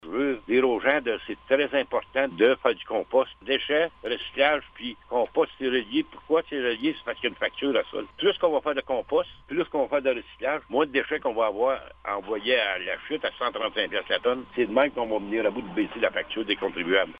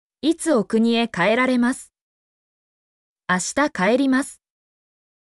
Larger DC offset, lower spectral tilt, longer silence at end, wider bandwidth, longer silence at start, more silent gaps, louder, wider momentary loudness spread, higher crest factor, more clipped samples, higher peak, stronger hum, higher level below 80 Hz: neither; first, -6.5 dB/octave vs -4 dB/octave; second, 0 s vs 0.9 s; second, 5 kHz vs 12 kHz; second, 0.05 s vs 0.25 s; second, none vs 2.01-3.16 s; second, -26 LUFS vs -20 LUFS; about the same, 7 LU vs 6 LU; first, 22 dB vs 14 dB; neither; first, -4 dBFS vs -8 dBFS; neither; about the same, -58 dBFS vs -62 dBFS